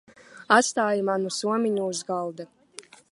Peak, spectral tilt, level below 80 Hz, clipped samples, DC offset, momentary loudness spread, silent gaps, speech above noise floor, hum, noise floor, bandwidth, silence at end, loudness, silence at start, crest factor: -2 dBFS; -3.5 dB/octave; -78 dBFS; under 0.1%; under 0.1%; 23 LU; none; 24 dB; none; -48 dBFS; 11.5 kHz; 0.3 s; -24 LUFS; 0.35 s; 24 dB